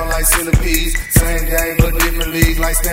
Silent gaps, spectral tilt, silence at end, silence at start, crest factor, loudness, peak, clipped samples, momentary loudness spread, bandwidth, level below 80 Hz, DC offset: none; -4 dB/octave; 0 s; 0 s; 14 dB; -15 LUFS; 0 dBFS; under 0.1%; 3 LU; 16.5 kHz; -18 dBFS; under 0.1%